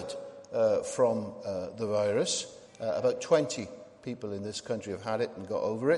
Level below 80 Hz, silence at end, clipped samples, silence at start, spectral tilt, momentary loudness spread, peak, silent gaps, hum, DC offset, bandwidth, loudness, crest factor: -70 dBFS; 0 s; under 0.1%; 0 s; -4.5 dB/octave; 13 LU; -12 dBFS; none; none; under 0.1%; 11.5 kHz; -31 LUFS; 18 dB